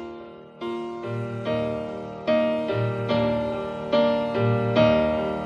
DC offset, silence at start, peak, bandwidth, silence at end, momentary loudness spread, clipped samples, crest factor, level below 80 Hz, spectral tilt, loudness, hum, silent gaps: under 0.1%; 0 s; -6 dBFS; 7.6 kHz; 0 s; 13 LU; under 0.1%; 18 dB; -50 dBFS; -8 dB/octave; -24 LUFS; none; none